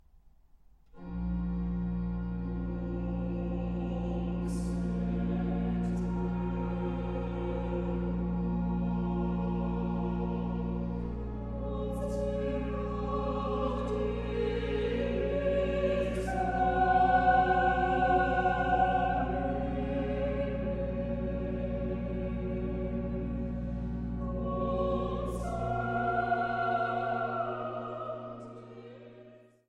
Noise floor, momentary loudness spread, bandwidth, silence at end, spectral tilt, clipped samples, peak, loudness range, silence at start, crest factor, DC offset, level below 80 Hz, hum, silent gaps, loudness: -59 dBFS; 9 LU; 11 kHz; 0.3 s; -8 dB/octave; under 0.1%; -12 dBFS; 7 LU; 0.95 s; 18 dB; under 0.1%; -40 dBFS; none; none; -32 LUFS